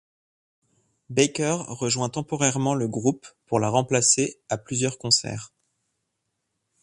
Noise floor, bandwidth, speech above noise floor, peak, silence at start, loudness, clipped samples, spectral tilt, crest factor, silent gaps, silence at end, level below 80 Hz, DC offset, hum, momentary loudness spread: -78 dBFS; 11.5 kHz; 54 dB; -4 dBFS; 1.1 s; -23 LUFS; under 0.1%; -3.5 dB/octave; 22 dB; none; 1.35 s; -62 dBFS; under 0.1%; none; 9 LU